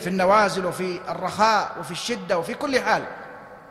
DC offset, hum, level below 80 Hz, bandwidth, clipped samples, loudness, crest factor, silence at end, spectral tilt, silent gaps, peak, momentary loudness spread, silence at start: under 0.1%; none; -58 dBFS; 15 kHz; under 0.1%; -23 LUFS; 18 dB; 0 s; -4 dB/octave; none; -6 dBFS; 15 LU; 0 s